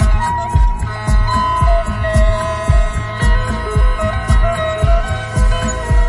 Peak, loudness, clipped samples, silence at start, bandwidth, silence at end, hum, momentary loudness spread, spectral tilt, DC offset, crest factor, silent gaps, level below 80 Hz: 0 dBFS; -16 LUFS; under 0.1%; 0 s; 11.5 kHz; 0 s; none; 3 LU; -6 dB/octave; under 0.1%; 12 dB; none; -16 dBFS